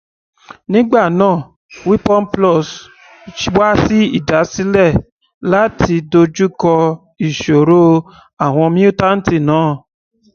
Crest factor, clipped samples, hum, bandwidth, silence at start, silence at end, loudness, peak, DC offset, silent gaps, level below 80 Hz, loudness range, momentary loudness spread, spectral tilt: 14 dB; under 0.1%; none; 7 kHz; 0.7 s; 0.55 s; -13 LUFS; 0 dBFS; under 0.1%; 1.56-1.69 s, 5.12-5.19 s, 5.34-5.41 s, 8.33-8.37 s; -38 dBFS; 2 LU; 9 LU; -6.5 dB/octave